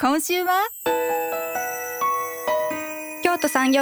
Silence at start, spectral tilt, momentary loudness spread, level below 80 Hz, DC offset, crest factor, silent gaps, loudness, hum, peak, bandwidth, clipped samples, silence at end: 0 s; -2 dB/octave; 6 LU; -64 dBFS; under 0.1%; 22 dB; none; -23 LUFS; none; -2 dBFS; over 20 kHz; under 0.1%; 0 s